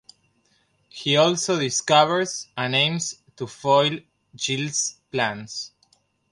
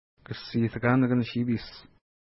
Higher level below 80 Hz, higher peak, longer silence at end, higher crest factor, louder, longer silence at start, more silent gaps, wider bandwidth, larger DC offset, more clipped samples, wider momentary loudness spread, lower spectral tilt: second, -68 dBFS vs -58 dBFS; first, -4 dBFS vs -10 dBFS; first, 0.65 s vs 0.45 s; about the same, 20 dB vs 18 dB; first, -22 LUFS vs -27 LUFS; first, 0.95 s vs 0.3 s; neither; first, 11.5 kHz vs 5.8 kHz; neither; neither; about the same, 16 LU vs 17 LU; second, -3 dB/octave vs -11 dB/octave